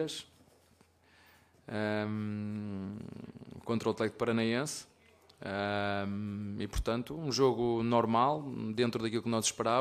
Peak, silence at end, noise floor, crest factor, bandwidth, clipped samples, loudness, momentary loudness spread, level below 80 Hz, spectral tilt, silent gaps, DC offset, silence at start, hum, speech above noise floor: -14 dBFS; 0 s; -66 dBFS; 20 dB; 15 kHz; under 0.1%; -33 LUFS; 14 LU; -54 dBFS; -5 dB/octave; none; under 0.1%; 0 s; none; 33 dB